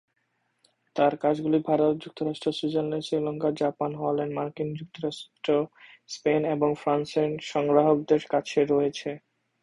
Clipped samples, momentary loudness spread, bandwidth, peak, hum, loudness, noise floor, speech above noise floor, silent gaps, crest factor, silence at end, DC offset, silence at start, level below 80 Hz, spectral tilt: under 0.1%; 11 LU; 11 kHz; -6 dBFS; none; -27 LUFS; -69 dBFS; 43 dB; none; 20 dB; 0.45 s; under 0.1%; 0.95 s; -68 dBFS; -6.5 dB/octave